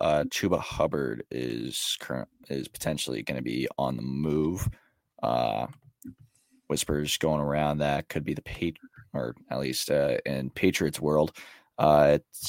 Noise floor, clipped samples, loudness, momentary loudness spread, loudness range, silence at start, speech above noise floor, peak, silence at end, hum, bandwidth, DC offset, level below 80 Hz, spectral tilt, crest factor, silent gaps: -60 dBFS; under 0.1%; -28 LUFS; 10 LU; 4 LU; 0 s; 33 dB; -6 dBFS; 0 s; none; 16.5 kHz; under 0.1%; -50 dBFS; -5 dB/octave; 22 dB; none